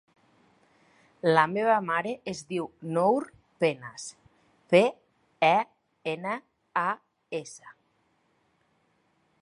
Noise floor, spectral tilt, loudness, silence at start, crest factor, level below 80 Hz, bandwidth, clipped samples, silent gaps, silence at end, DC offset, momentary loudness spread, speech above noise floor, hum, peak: -70 dBFS; -5 dB/octave; -27 LUFS; 1.25 s; 24 dB; -74 dBFS; 11 kHz; under 0.1%; none; 1.7 s; under 0.1%; 16 LU; 44 dB; none; -6 dBFS